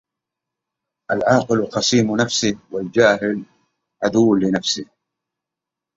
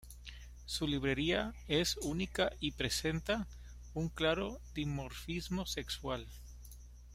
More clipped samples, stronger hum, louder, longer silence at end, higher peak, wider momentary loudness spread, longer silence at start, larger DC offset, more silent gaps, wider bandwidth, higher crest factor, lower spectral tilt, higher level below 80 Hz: neither; second, none vs 60 Hz at -50 dBFS; first, -18 LUFS vs -37 LUFS; first, 1.15 s vs 0 s; first, -2 dBFS vs -18 dBFS; second, 9 LU vs 18 LU; first, 1.1 s vs 0 s; neither; neither; second, 7.8 kHz vs 16 kHz; about the same, 18 dB vs 20 dB; about the same, -4.5 dB/octave vs -4 dB/octave; second, -56 dBFS vs -50 dBFS